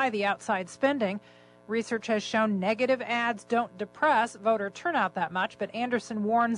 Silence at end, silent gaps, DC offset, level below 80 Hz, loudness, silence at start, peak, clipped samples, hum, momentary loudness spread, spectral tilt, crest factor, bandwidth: 0 s; none; under 0.1%; -72 dBFS; -28 LUFS; 0 s; -14 dBFS; under 0.1%; 60 Hz at -55 dBFS; 6 LU; -5 dB/octave; 14 dB; 11 kHz